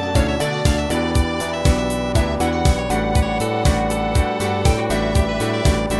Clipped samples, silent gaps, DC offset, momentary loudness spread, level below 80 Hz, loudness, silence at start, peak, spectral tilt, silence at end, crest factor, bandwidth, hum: under 0.1%; none; 0.3%; 2 LU; -24 dBFS; -19 LUFS; 0 s; -4 dBFS; -5.5 dB/octave; 0 s; 14 dB; 11 kHz; none